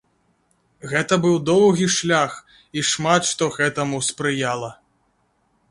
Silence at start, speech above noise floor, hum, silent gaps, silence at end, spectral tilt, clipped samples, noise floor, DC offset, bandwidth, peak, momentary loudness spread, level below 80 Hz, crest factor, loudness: 0.85 s; 46 dB; none; none; 0.95 s; -4 dB/octave; under 0.1%; -65 dBFS; under 0.1%; 11.5 kHz; -2 dBFS; 12 LU; -60 dBFS; 18 dB; -20 LUFS